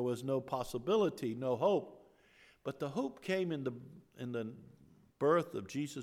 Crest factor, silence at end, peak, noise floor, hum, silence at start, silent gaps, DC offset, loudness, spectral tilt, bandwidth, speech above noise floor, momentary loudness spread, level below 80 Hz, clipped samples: 18 dB; 0 s; -20 dBFS; -65 dBFS; none; 0 s; none; under 0.1%; -36 LUFS; -6.5 dB/octave; 16 kHz; 30 dB; 15 LU; -70 dBFS; under 0.1%